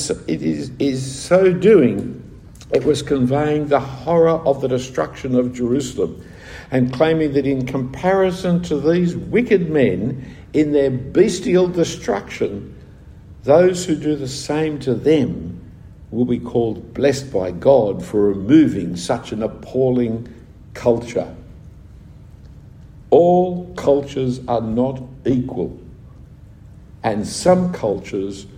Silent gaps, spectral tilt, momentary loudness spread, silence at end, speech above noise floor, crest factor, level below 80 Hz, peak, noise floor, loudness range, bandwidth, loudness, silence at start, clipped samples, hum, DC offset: none; -6.5 dB/octave; 12 LU; 0 s; 24 dB; 18 dB; -44 dBFS; 0 dBFS; -41 dBFS; 5 LU; 15 kHz; -18 LUFS; 0 s; under 0.1%; none; under 0.1%